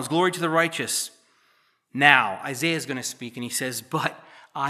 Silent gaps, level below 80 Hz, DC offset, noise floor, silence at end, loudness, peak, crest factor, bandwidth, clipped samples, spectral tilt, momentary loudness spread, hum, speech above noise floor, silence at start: none; -82 dBFS; under 0.1%; -65 dBFS; 0 s; -23 LUFS; 0 dBFS; 26 dB; 15 kHz; under 0.1%; -3 dB/octave; 16 LU; none; 41 dB; 0 s